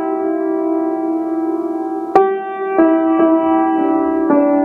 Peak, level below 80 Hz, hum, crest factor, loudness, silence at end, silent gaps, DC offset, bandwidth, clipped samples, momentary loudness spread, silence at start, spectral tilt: 0 dBFS; -56 dBFS; none; 14 dB; -16 LUFS; 0 s; none; under 0.1%; 3.7 kHz; under 0.1%; 7 LU; 0 s; -8 dB/octave